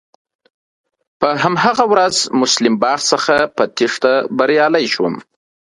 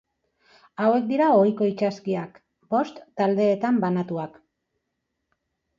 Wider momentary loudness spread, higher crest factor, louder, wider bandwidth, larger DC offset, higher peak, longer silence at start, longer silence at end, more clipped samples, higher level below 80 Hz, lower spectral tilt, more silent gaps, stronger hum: second, 6 LU vs 13 LU; about the same, 16 dB vs 18 dB; first, -14 LUFS vs -23 LUFS; first, 11.5 kHz vs 7.4 kHz; neither; first, 0 dBFS vs -8 dBFS; first, 1.2 s vs 0.8 s; second, 0.45 s vs 1.5 s; neither; first, -58 dBFS vs -72 dBFS; second, -3 dB/octave vs -8 dB/octave; neither; neither